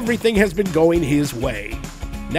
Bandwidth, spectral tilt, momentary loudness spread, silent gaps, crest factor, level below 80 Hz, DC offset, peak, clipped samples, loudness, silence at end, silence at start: 16 kHz; -6 dB/octave; 15 LU; none; 18 dB; -34 dBFS; under 0.1%; -2 dBFS; under 0.1%; -19 LUFS; 0 s; 0 s